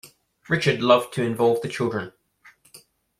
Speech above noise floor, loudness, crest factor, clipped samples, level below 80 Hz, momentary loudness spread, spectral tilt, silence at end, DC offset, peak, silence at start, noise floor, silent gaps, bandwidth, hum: 34 dB; -22 LUFS; 22 dB; under 0.1%; -60 dBFS; 9 LU; -5.5 dB/octave; 0.4 s; under 0.1%; -4 dBFS; 0.05 s; -55 dBFS; none; 15.5 kHz; none